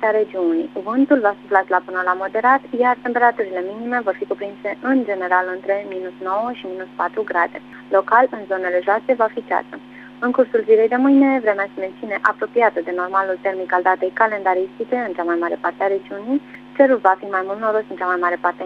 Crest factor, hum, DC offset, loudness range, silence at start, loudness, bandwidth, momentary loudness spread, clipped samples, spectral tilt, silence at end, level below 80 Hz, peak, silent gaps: 18 dB; none; under 0.1%; 4 LU; 0 s; -19 LUFS; 5.6 kHz; 10 LU; under 0.1%; -7 dB/octave; 0 s; -66 dBFS; 0 dBFS; none